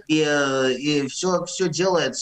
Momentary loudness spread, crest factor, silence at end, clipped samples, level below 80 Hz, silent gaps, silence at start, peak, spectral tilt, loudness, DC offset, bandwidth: 3 LU; 14 dB; 0 s; under 0.1%; -62 dBFS; none; 0.1 s; -8 dBFS; -4 dB/octave; -21 LUFS; under 0.1%; 9.6 kHz